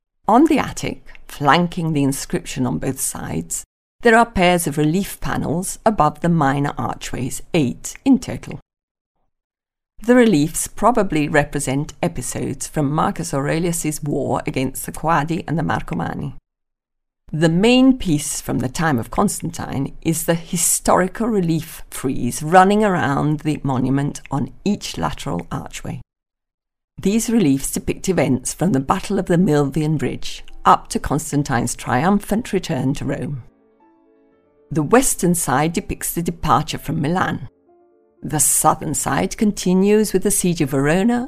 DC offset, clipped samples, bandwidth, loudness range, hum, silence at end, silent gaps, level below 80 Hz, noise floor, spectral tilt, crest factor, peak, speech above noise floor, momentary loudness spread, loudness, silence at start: under 0.1%; under 0.1%; 16 kHz; 5 LU; none; 0 s; 3.66-3.99 s, 8.62-8.66 s, 8.83-8.95 s, 9.01-9.15 s, 9.44-9.50 s, 26.54-26.58 s, 26.84-26.88 s; -38 dBFS; -77 dBFS; -5 dB/octave; 20 dB; 0 dBFS; 59 dB; 11 LU; -19 LUFS; 0.3 s